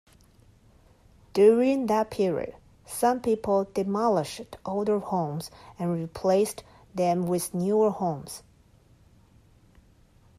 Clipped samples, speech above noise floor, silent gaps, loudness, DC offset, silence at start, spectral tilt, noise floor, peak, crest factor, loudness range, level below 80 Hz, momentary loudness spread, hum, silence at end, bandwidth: under 0.1%; 33 dB; none; -26 LUFS; under 0.1%; 1.35 s; -6 dB/octave; -58 dBFS; -8 dBFS; 18 dB; 4 LU; -60 dBFS; 15 LU; none; 2 s; 15.5 kHz